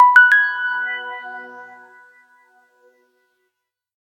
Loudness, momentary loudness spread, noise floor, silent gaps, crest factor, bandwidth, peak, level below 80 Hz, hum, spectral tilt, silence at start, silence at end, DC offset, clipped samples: -14 LUFS; 26 LU; -77 dBFS; none; 20 dB; 10.5 kHz; 0 dBFS; -90 dBFS; none; 0.5 dB/octave; 0 s; 2.35 s; under 0.1%; under 0.1%